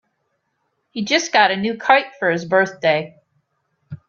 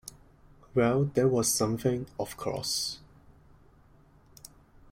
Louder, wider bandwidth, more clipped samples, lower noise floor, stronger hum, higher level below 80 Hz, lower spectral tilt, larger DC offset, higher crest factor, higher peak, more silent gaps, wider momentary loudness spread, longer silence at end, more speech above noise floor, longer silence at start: first, -17 LUFS vs -29 LUFS; second, 7.4 kHz vs 16.5 kHz; neither; first, -71 dBFS vs -59 dBFS; neither; second, -66 dBFS vs -58 dBFS; about the same, -3.5 dB/octave vs -4.5 dB/octave; neither; about the same, 20 dB vs 18 dB; first, 0 dBFS vs -12 dBFS; neither; second, 11 LU vs 22 LU; second, 0.1 s vs 1.6 s; first, 53 dB vs 31 dB; first, 0.95 s vs 0.05 s